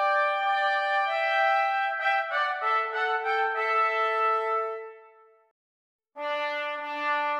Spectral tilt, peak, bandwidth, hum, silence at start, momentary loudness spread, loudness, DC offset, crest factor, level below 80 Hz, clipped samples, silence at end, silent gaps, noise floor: 0.5 dB/octave; -14 dBFS; 9.4 kHz; none; 0 s; 7 LU; -26 LUFS; under 0.1%; 14 dB; under -90 dBFS; under 0.1%; 0 s; 5.51-5.99 s; -56 dBFS